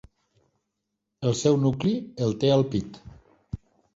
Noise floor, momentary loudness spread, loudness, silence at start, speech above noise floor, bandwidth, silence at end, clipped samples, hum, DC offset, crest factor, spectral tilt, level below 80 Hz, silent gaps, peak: -81 dBFS; 19 LU; -25 LUFS; 1.2 s; 58 dB; 8 kHz; 0.4 s; under 0.1%; none; under 0.1%; 18 dB; -6.5 dB/octave; -52 dBFS; none; -8 dBFS